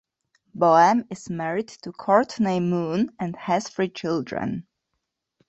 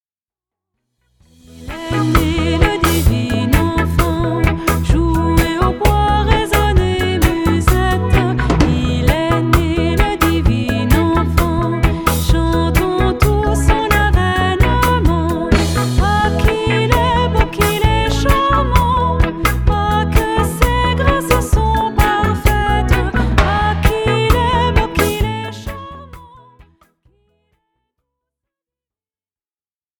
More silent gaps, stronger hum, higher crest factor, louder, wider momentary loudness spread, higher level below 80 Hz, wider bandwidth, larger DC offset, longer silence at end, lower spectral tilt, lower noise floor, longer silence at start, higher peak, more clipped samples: neither; neither; first, 20 dB vs 14 dB; second, -23 LUFS vs -15 LUFS; first, 15 LU vs 3 LU; second, -62 dBFS vs -20 dBFS; second, 8.2 kHz vs over 20 kHz; neither; second, 0.9 s vs 3.75 s; about the same, -6 dB/octave vs -6 dB/octave; second, -80 dBFS vs under -90 dBFS; second, 0.55 s vs 1.55 s; second, -4 dBFS vs 0 dBFS; neither